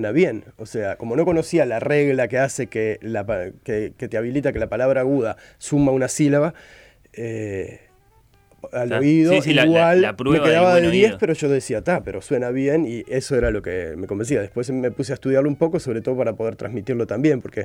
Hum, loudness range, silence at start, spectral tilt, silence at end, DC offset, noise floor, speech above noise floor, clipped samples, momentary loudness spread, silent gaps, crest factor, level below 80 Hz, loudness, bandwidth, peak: none; 7 LU; 0 s; -6 dB/octave; 0 s; under 0.1%; -56 dBFS; 36 dB; under 0.1%; 12 LU; none; 16 dB; -46 dBFS; -20 LUFS; 15.5 kHz; -4 dBFS